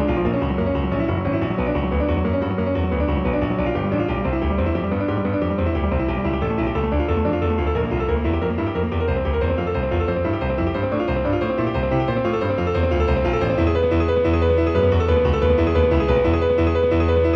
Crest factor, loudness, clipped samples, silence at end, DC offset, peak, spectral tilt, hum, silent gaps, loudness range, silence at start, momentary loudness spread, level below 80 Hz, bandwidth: 14 dB; -21 LUFS; under 0.1%; 0 s; under 0.1%; -4 dBFS; -9 dB/octave; none; none; 4 LU; 0 s; 4 LU; -28 dBFS; 6.2 kHz